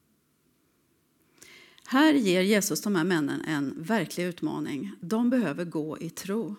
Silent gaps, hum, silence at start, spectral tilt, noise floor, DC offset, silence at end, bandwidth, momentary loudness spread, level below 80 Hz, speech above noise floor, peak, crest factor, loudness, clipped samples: none; none; 1.5 s; -4.5 dB/octave; -69 dBFS; under 0.1%; 0 s; 17.5 kHz; 11 LU; -76 dBFS; 43 dB; -8 dBFS; 20 dB; -27 LUFS; under 0.1%